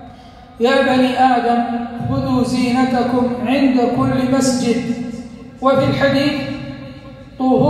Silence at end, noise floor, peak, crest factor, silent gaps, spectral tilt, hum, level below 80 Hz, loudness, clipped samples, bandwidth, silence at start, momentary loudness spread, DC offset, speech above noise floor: 0 s; -39 dBFS; -2 dBFS; 14 dB; none; -5.5 dB/octave; none; -44 dBFS; -16 LUFS; under 0.1%; 13.5 kHz; 0 s; 15 LU; under 0.1%; 24 dB